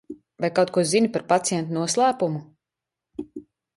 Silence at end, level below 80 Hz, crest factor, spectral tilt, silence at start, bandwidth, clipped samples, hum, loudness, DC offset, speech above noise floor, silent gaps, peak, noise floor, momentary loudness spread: 0.35 s; -66 dBFS; 18 dB; -4.5 dB/octave; 0.1 s; 11.5 kHz; under 0.1%; none; -22 LUFS; under 0.1%; 64 dB; none; -6 dBFS; -87 dBFS; 20 LU